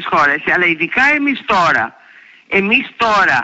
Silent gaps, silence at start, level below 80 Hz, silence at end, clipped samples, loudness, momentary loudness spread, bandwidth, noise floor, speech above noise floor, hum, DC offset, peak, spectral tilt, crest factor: none; 0 s; -50 dBFS; 0 s; under 0.1%; -13 LUFS; 5 LU; 8 kHz; -43 dBFS; 30 dB; none; under 0.1%; -2 dBFS; -4.5 dB/octave; 12 dB